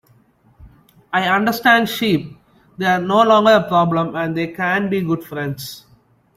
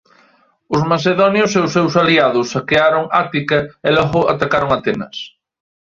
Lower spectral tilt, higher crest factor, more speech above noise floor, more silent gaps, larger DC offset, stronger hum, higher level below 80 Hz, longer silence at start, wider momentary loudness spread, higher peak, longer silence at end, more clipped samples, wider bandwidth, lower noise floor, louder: about the same, -5.5 dB/octave vs -5.5 dB/octave; about the same, 16 dB vs 16 dB; about the same, 38 dB vs 40 dB; neither; neither; neither; second, -56 dBFS vs -48 dBFS; about the same, 0.6 s vs 0.7 s; first, 13 LU vs 8 LU; about the same, -2 dBFS vs 0 dBFS; about the same, 0.6 s vs 0.55 s; neither; first, 16 kHz vs 7.6 kHz; about the same, -54 dBFS vs -54 dBFS; about the same, -17 LUFS vs -15 LUFS